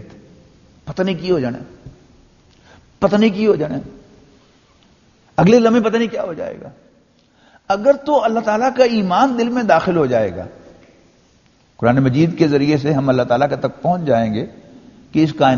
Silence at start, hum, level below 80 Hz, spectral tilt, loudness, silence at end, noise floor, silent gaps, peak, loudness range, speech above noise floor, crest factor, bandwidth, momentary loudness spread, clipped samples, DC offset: 0 s; none; -50 dBFS; -6 dB/octave; -16 LUFS; 0 s; -54 dBFS; none; 0 dBFS; 5 LU; 39 dB; 18 dB; 7.2 kHz; 11 LU; under 0.1%; under 0.1%